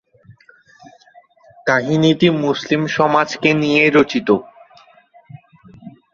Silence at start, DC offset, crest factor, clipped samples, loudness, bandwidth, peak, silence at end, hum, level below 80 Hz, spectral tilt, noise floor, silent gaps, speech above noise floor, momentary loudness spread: 0.3 s; under 0.1%; 18 dB; under 0.1%; -15 LUFS; 7.4 kHz; 0 dBFS; 0.25 s; none; -58 dBFS; -6 dB/octave; -50 dBFS; none; 35 dB; 6 LU